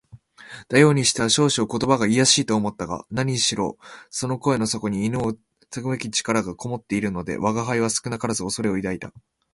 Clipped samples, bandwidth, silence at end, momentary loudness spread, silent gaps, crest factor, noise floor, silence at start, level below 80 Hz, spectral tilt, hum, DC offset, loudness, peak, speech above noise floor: under 0.1%; 11.5 kHz; 0.35 s; 15 LU; none; 22 dB; -46 dBFS; 0.15 s; -52 dBFS; -4 dB/octave; none; under 0.1%; -22 LUFS; -2 dBFS; 24 dB